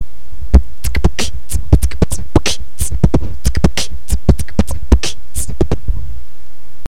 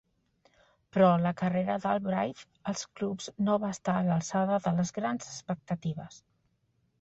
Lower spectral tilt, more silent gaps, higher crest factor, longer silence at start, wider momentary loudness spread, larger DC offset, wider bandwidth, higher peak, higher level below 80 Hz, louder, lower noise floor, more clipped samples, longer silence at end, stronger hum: second, -5 dB/octave vs -6.5 dB/octave; neither; about the same, 18 dB vs 20 dB; second, 0 s vs 0.95 s; about the same, 10 LU vs 12 LU; first, 30% vs under 0.1%; first, 16 kHz vs 8 kHz; first, 0 dBFS vs -12 dBFS; first, -18 dBFS vs -68 dBFS; first, -17 LUFS vs -30 LUFS; second, -43 dBFS vs -73 dBFS; first, 0.6% vs under 0.1%; second, 0.65 s vs 0.85 s; neither